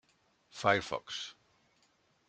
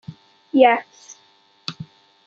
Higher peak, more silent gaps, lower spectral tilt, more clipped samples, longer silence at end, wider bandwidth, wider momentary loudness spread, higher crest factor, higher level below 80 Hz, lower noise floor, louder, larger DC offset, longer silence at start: second, -12 dBFS vs -2 dBFS; neither; second, -3.5 dB/octave vs -5 dB/octave; neither; first, 0.95 s vs 0.45 s; first, 9.4 kHz vs 7.4 kHz; second, 16 LU vs 26 LU; first, 26 dB vs 20 dB; about the same, -72 dBFS vs -70 dBFS; first, -72 dBFS vs -57 dBFS; second, -33 LUFS vs -17 LUFS; neither; first, 0.55 s vs 0.1 s